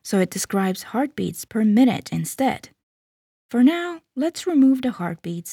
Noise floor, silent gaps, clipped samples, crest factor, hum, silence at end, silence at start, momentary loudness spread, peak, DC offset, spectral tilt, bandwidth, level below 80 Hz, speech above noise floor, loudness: under -90 dBFS; 2.83-3.49 s; under 0.1%; 16 dB; none; 0 s; 0.05 s; 11 LU; -6 dBFS; under 0.1%; -5.5 dB/octave; 17 kHz; -64 dBFS; over 69 dB; -22 LUFS